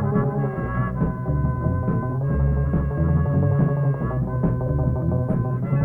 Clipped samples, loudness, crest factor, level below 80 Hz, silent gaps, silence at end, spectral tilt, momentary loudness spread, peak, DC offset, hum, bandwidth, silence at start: under 0.1%; -23 LUFS; 12 dB; -30 dBFS; none; 0 s; -12.5 dB/octave; 4 LU; -8 dBFS; under 0.1%; none; 2.9 kHz; 0 s